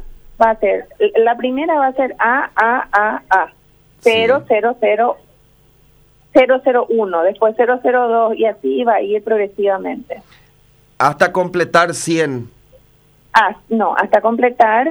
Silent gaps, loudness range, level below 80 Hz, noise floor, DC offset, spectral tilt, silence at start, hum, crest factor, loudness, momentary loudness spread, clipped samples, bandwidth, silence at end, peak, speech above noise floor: none; 3 LU; -50 dBFS; -51 dBFS; under 0.1%; -4.5 dB/octave; 0 s; 50 Hz at -60 dBFS; 16 dB; -15 LUFS; 5 LU; under 0.1%; over 20 kHz; 0 s; 0 dBFS; 36 dB